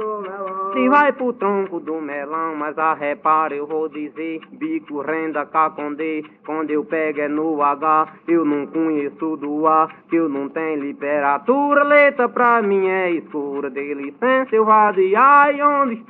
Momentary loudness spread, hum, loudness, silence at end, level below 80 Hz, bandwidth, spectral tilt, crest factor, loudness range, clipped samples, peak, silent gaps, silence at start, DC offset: 13 LU; none; -18 LUFS; 0.05 s; -76 dBFS; 4.8 kHz; -4 dB/octave; 18 dB; 6 LU; under 0.1%; -2 dBFS; none; 0 s; under 0.1%